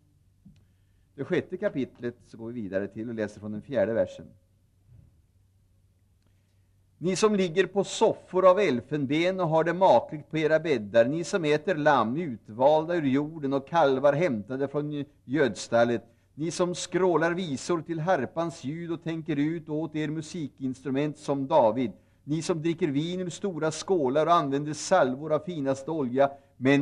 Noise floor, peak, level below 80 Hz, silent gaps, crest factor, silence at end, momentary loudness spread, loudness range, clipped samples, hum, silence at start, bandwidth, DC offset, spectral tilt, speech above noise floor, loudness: -64 dBFS; -8 dBFS; -68 dBFS; none; 18 dB; 0 s; 11 LU; 9 LU; under 0.1%; none; 1.15 s; 11 kHz; under 0.1%; -5.5 dB/octave; 38 dB; -27 LUFS